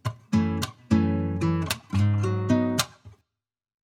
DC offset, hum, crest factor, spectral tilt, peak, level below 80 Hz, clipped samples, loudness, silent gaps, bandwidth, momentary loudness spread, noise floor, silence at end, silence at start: under 0.1%; none; 18 dB; -6 dB/octave; -6 dBFS; -50 dBFS; under 0.1%; -25 LUFS; none; 17 kHz; 5 LU; -87 dBFS; 0.75 s; 0.05 s